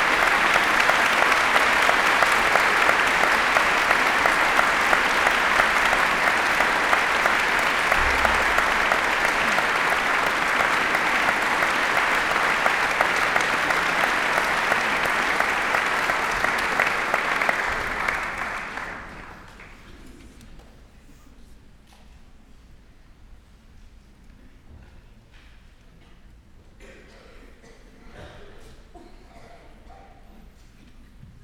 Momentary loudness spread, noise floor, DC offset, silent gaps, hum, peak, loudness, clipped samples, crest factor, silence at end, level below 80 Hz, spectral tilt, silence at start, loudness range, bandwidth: 5 LU; -49 dBFS; under 0.1%; none; none; -2 dBFS; -20 LUFS; under 0.1%; 22 dB; 0.15 s; -46 dBFS; -2 dB/octave; 0 s; 8 LU; 19.5 kHz